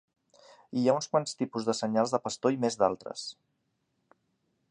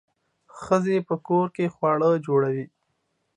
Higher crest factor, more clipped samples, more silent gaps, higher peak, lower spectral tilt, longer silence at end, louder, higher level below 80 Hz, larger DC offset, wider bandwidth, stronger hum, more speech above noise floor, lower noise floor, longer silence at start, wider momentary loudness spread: about the same, 20 dB vs 18 dB; neither; neither; second, -10 dBFS vs -6 dBFS; second, -5 dB/octave vs -8 dB/octave; first, 1.4 s vs 0.7 s; second, -30 LUFS vs -24 LUFS; second, -74 dBFS vs -66 dBFS; neither; about the same, 10 kHz vs 10 kHz; neither; about the same, 49 dB vs 51 dB; first, -78 dBFS vs -74 dBFS; first, 0.7 s vs 0.55 s; about the same, 10 LU vs 10 LU